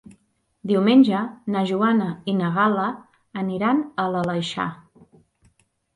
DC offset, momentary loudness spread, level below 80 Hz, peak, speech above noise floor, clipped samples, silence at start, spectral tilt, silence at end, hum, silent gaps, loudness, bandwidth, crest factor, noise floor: under 0.1%; 13 LU; -64 dBFS; -6 dBFS; 44 dB; under 0.1%; 0.65 s; -7 dB/octave; 1.2 s; none; none; -22 LUFS; 10.5 kHz; 18 dB; -65 dBFS